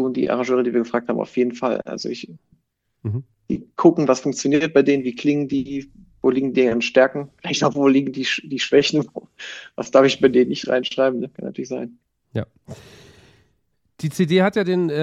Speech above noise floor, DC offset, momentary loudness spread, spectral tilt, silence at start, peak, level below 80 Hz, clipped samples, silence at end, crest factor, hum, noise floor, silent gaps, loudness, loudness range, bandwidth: 49 dB; under 0.1%; 15 LU; -5.5 dB/octave; 0 s; -2 dBFS; -60 dBFS; under 0.1%; 0 s; 20 dB; none; -69 dBFS; none; -20 LUFS; 6 LU; 12.5 kHz